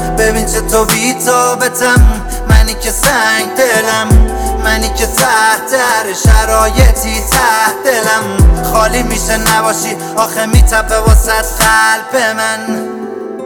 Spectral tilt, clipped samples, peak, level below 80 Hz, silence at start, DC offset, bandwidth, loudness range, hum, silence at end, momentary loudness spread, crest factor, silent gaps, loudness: -3.5 dB/octave; 0.6%; 0 dBFS; -14 dBFS; 0 s; under 0.1%; over 20 kHz; 1 LU; none; 0 s; 6 LU; 10 dB; none; -10 LUFS